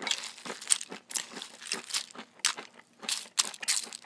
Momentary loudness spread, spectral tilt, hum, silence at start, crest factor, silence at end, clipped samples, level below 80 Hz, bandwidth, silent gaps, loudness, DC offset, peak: 13 LU; 1.5 dB/octave; none; 0 s; 32 dB; 0 s; under 0.1%; under -90 dBFS; 11 kHz; none; -32 LUFS; under 0.1%; -2 dBFS